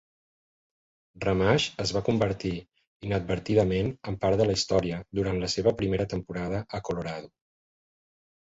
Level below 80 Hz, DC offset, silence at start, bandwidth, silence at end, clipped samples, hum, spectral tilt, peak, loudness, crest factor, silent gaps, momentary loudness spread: -48 dBFS; under 0.1%; 1.15 s; 8 kHz; 1.15 s; under 0.1%; none; -5.5 dB/octave; -10 dBFS; -28 LUFS; 20 dB; 2.87-3.00 s; 9 LU